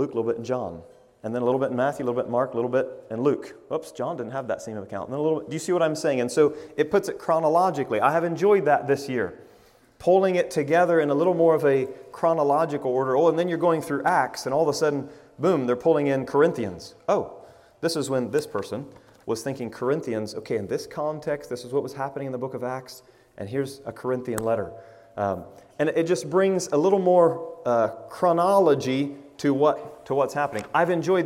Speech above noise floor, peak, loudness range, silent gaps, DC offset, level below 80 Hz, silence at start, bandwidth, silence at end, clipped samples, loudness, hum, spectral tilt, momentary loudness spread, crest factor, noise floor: 32 dB; -6 dBFS; 8 LU; none; under 0.1%; -64 dBFS; 0 s; 16 kHz; 0 s; under 0.1%; -24 LUFS; none; -6 dB/octave; 12 LU; 18 dB; -55 dBFS